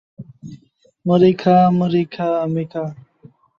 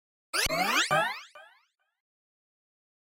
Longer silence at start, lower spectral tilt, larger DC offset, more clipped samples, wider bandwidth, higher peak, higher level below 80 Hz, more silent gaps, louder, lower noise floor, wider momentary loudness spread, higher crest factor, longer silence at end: second, 0.2 s vs 0.35 s; first, -9 dB/octave vs -1.5 dB/octave; neither; neither; second, 6.8 kHz vs 16 kHz; first, -2 dBFS vs -14 dBFS; about the same, -58 dBFS vs -54 dBFS; neither; first, -17 LUFS vs -27 LUFS; second, -53 dBFS vs -67 dBFS; first, 16 LU vs 8 LU; about the same, 16 dB vs 20 dB; second, 0.65 s vs 1.7 s